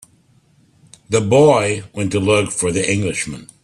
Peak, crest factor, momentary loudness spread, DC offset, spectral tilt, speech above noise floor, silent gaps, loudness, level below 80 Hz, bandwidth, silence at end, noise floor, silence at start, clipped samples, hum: 0 dBFS; 18 dB; 10 LU; under 0.1%; -4.5 dB/octave; 38 dB; none; -17 LUFS; -50 dBFS; 12.5 kHz; 0.2 s; -55 dBFS; 1.1 s; under 0.1%; none